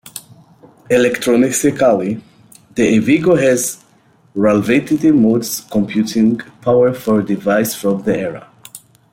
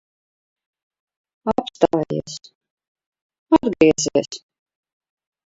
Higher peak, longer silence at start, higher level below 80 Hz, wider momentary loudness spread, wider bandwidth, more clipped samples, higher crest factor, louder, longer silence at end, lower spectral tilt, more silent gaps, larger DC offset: about the same, -2 dBFS vs 0 dBFS; second, 0.05 s vs 1.45 s; about the same, -54 dBFS vs -54 dBFS; second, 13 LU vs 19 LU; first, 16.5 kHz vs 7.8 kHz; neither; second, 14 dB vs 22 dB; first, -15 LUFS vs -19 LUFS; second, 0.35 s vs 1.1 s; about the same, -5 dB/octave vs -4.5 dB/octave; second, none vs 2.55-2.61 s, 2.70-2.77 s, 2.88-2.95 s, 3.06-3.12 s, 3.22-3.30 s, 3.39-3.46 s; neither